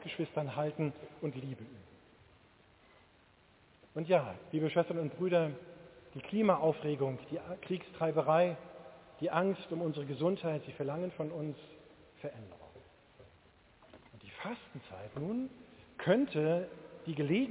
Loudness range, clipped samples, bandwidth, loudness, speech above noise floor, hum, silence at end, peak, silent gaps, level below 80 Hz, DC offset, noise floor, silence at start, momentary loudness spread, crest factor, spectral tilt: 13 LU; under 0.1%; 4 kHz; -35 LUFS; 31 dB; none; 0 s; -14 dBFS; none; -70 dBFS; under 0.1%; -65 dBFS; 0 s; 21 LU; 22 dB; -6 dB/octave